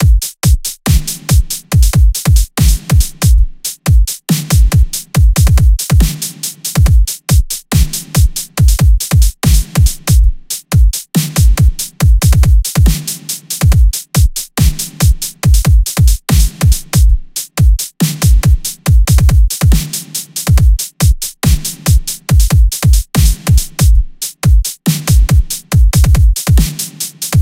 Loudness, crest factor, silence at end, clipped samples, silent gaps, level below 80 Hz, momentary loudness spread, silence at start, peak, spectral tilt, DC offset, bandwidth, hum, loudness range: -12 LUFS; 10 dB; 0 s; under 0.1%; none; -12 dBFS; 6 LU; 0 s; 0 dBFS; -4.5 dB/octave; under 0.1%; 16.5 kHz; none; 1 LU